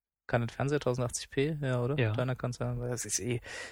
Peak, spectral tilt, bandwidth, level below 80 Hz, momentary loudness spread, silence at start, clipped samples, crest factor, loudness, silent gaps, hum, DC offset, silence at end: -14 dBFS; -5 dB/octave; 16.5 kHz; -54 dBFS; 5 LU; 0.3 s; under 0.1%; 18 dB; -33 LUFS; none; none; under 0.1%; 0 s